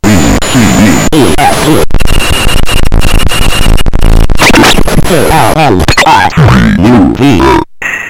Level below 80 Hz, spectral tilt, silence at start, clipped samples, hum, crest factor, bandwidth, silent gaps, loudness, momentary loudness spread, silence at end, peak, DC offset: -10 dBFS; -4.5 dB/octave; 0 s; 7%; none; 4 dB; 16.5 kHz; none; -6 LUFS; 6 LU; 0 s; 0 dBFS; 8%